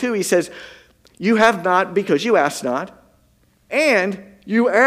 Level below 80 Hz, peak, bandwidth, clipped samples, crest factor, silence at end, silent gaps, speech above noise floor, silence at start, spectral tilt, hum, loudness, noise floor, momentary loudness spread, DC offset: -62 dBFS; 0 dBFS; 16 kHz; under 0.1%; 18 dB; 0 s; none; 40 dB; 0 s; -4.5 dB/octave; none; -18 LUFS; -58 dBFS; 13 LU; under 0.1%